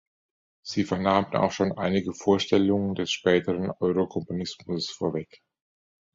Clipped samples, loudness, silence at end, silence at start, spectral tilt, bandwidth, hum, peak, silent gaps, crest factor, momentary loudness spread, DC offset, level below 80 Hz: under 0.1%; -26 LUFS; 0.9 s; 0.65 s; -5.5 dB/octave; 7.8 kHz; none; -6 dBFS; none; 20 dB; 10 LU; under 0.1%; -54 dBFS